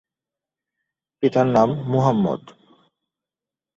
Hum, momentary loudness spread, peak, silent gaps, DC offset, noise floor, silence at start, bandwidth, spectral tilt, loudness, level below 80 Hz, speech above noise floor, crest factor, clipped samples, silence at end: none; 7 LU; -2 dBFS; none; under 0.1%; -89 dBFS; 1.2 s; 7.6 kHz; -8.5 dB/octave; -20 LUFS; -58 dBFS; 71 dB; 20 dB; under 0.1%; 1.4 s